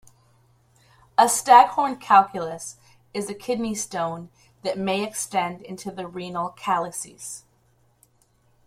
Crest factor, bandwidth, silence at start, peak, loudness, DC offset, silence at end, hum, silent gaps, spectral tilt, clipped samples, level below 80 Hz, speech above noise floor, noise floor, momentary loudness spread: 22 dB; 16 kHz; 1.2 s; -2 dBFS; -22 LUFS; under 0.1%; 1.3 s; none; none; -3 dB/octave; under 0.1%; -64 dBFS; 40 dB; -63 dBFS; 20 LU